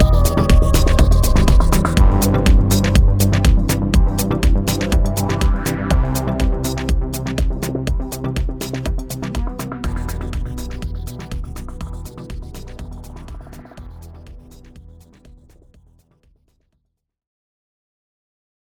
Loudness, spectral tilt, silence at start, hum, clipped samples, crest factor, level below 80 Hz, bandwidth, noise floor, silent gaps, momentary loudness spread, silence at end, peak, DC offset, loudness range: -18 LUFS; -5.5 dB/octave; 0 s; none; under 0.1%; 16 dB; -18 dBFS; over 20 kHz; -70 dBFS; none; 20 LU; 3.85 s; -2 dBFS; under 0.1%; 20 LU